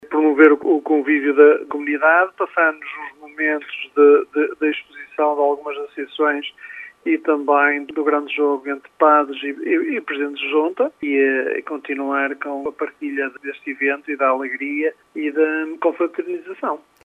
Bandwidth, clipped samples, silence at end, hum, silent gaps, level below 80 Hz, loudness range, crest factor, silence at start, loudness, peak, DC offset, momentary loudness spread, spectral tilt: 3.9 kHz; under 0.1%; 0.25 s; none; none; -74 dBFS; 6 LU; 18 dB; 0.05 s; -19 LUFS; 0 dBFS; under 0.1%; 15 LU; -5 dB/octave